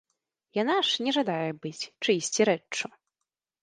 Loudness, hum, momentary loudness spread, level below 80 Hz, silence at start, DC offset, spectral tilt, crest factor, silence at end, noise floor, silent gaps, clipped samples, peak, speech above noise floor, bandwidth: -27 LUFS; none; 10 LU; -78 dBFS; 0.55 s; under 0.1%; -3 dB/octave; 20 dB; 0.75 s; -87 dBFS; none; under 0.1%; -10 dBFS; 59 dB; 10.5 kHz